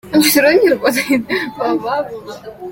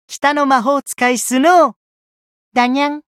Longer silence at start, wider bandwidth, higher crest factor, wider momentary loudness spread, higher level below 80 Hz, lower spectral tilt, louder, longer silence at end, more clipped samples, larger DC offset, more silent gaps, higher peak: about the same, 0.05 s vs 0.1 s; about the same, 17 kHz vs 15.5 kHz; about the same, 16 dB vs 14 dB; first, 19 LU vs 7 LU; first, -52 dBFS vs -66 dBFS; about the same, -3 dB/octave vs -2.5 dB/octave; about the same, -14 LUFS vs -14 LUFS; second, 0 s vs 0.2 s; neither; neither; second, none vs 1.76-2.52 s; about the same, 0 dBFS vs 0 dBFS